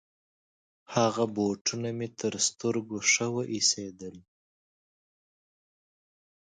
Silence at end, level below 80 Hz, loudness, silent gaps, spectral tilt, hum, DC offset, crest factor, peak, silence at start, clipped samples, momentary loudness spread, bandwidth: 2.35 s; -72 dBFS; -28 LUFS; 1.61-1.65 s; -3 dB/octave; none; under 0.1%; 22 dB; -10 dBFS; 0.9 s; under 0.1%; 9 LU; 10.5 kHz